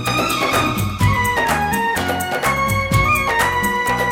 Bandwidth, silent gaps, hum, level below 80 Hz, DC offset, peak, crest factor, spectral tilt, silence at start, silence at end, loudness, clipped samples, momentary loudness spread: 19 kHz; none; none; -34 dBFS; under 0.1%; -2 dBFS; 14 dB; -4 dB/octave; 0 s; 0 s; -17 LUFS; under 0.1%; 4 LU